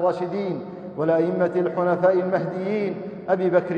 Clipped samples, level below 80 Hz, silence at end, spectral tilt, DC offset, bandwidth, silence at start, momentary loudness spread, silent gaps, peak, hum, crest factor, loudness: under 0.1%; -68 dBFS; 0 s; -9 dB/octave; under 0.1%; 6.8 kHz; 0 s; 9 LU; none; -8 dBFS; none; 16 dB; -23 LUFS